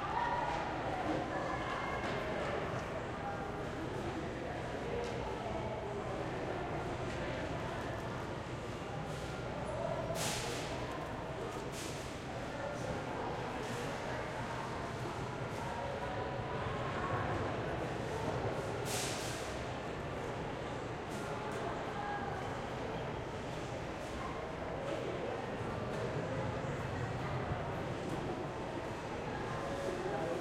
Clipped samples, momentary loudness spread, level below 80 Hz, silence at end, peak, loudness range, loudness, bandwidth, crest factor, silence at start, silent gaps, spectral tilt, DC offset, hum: under 0.1%; 5 LU; -54 dBFS; 0 s; -24 dBFS; 3 LU; -40 LUFS; 16 kHz; 16 dB; 0 s; none; -5 dB/octave; under 0.1%; none